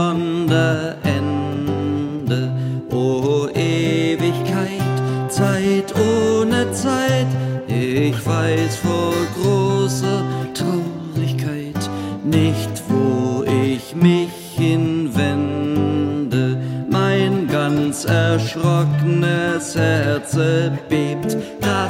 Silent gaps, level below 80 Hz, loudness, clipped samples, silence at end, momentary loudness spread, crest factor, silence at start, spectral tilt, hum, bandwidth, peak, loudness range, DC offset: none; -52 dBFS; -19 LUFS; under 0.1%; 0 s; 5 LU; 16 dB; 0 s; -6 dB/octave; none; 16 kHz; -2 dBFS; 2 LU; under 0.1%